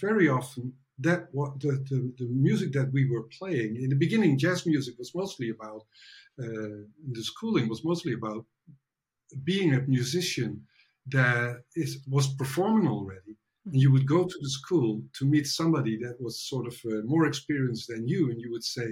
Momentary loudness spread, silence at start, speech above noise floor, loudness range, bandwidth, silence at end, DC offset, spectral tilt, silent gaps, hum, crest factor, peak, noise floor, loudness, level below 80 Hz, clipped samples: 13 LU; 0 s; 43 dB; 6 LU; 15.5 kHz; 0 s; under 0.1%; -6 dB/octave; none; none; 18 dB; -10 dBFS; -71 dBFS; -28 LUFS; -70 dBFS; under 0.1%